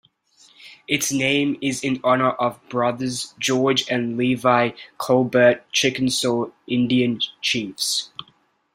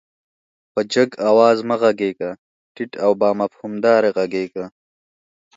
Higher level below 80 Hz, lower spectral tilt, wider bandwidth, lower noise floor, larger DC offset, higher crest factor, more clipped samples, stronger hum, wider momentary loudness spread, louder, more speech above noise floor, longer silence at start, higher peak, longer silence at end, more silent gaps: first, -62 dBFS vs -68 dBFS; second, -3.5 dB/octave vs -5.5 dB/octave; first, 16 kHz vs 8 kHz; second, -60 dBFS vs under -90 dBFS; neither; about the same, 18 dB vs 18 dB; neither; neither; second, 7 LU vs 16 LU; second, -21 LUFS vs -18 LUFS; second, 39 dB vs over 72 dB; second, 0.6 s vs 0.75 s; about the same, -2 dBFS vs 0 dBFS; second, 0.55 s vs 0.9 s; second, none vs 2.39-2.75 s